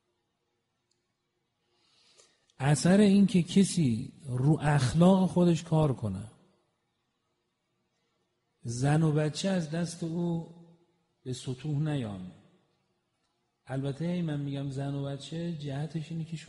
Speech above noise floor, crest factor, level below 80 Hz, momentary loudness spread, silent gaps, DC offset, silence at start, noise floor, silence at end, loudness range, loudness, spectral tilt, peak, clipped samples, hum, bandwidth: 52 dB; 20 dB; -60 dBFS; 16 LU; none; under 0.1%; 2.6 s; -80 dBFS; 0.05 s; 11 LU; -29 LUFS; -6.5 dB/octave; -10 dBFS; under 0.1%; none; 11.5 kHz